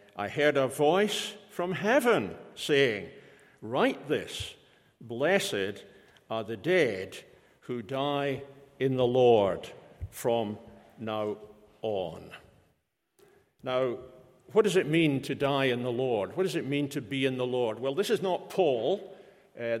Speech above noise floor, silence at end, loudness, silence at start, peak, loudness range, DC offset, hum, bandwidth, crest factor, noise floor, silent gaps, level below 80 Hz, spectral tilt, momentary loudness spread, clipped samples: 47 dB; 0 s; -29 LUFS; 0.15 s; -10 dBFS; 7 LU; under 0.1%; none; 16.5 kHz; 20 dB; -75 dBFS; none; -64 dBFS; -5 dB/octave; 16 LU; under 0.1%